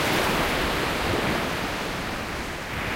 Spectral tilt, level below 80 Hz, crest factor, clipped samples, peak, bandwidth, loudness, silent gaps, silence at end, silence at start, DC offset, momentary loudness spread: -4 dB/octave; -38 dBFS; 16 dB; under 0.1%; -10 dBFS; 16 kHz; -26 LUFS; none; 0 s; 0 s; under 0.1%; 8 LU